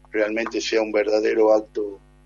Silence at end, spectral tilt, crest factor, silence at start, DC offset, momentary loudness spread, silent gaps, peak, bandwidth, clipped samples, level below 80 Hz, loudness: 0.3 s; -3 dB/octave; 16 dB; 0.15 s; under 0.1%; 12 LU; none; -6 dBFS; 7.4 kHz; under 0.1%; -54 dBFS; -21 LUFS